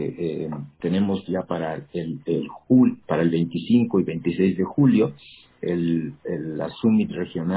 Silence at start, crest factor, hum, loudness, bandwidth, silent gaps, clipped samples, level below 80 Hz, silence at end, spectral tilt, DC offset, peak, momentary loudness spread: 0 s; 16 dB; none; -23 LUFS; 4 kHz; none; under 0.1%; -56 dBFS; 0 s; -12 dB/octave; under 0.1%; -8 dBFS; 12 LU